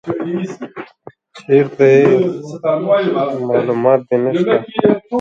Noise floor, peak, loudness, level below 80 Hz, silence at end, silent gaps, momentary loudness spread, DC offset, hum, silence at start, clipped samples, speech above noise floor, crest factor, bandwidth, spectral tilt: -39 dBFS; 0 dBFS; -15 LUFS; -60 dBFS; 0 s; none; 14 LU; under 0.1%; none; 0.05 s; under 0.1%; 25 dB; 14 dB; 7.4 kHz; -8 dB/octave